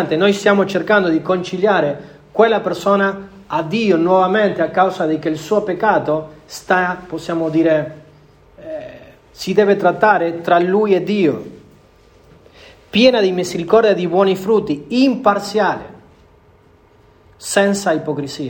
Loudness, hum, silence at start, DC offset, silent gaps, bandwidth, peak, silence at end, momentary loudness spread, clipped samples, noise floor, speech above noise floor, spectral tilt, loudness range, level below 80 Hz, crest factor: -16 LUFS; none; 0 s; under 0.1%; none; 18 kHz; 0 dBFS; 0 s; 13 LU; under 0.1%; -49 dBFS; 34 dB; -5.5 dB/octave; 4 LU; -54 dBFS; 16 dB